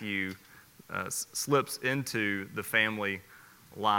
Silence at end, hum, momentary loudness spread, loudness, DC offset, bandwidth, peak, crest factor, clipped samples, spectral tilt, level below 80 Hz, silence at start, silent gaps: 0 s; none; 12 LU; -31 LUFS; under 0.1%; 17 kHz; -10 dBFS; 22 dB; under 0.1%; -3.5 dB/octave; -72 dBFS; 0 s; none